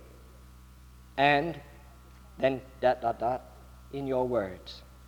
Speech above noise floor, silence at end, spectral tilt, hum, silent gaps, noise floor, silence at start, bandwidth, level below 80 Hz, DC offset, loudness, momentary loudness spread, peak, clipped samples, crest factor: 23 dB; 0 s; -6.5 dB/octave; none; none; -52 dBFS; 0 s; over 20 kHz; -52 dBFS; under 0.1%; -30 LUFS; 17 LU; -8 dBFS; under 0.1%; 22 dB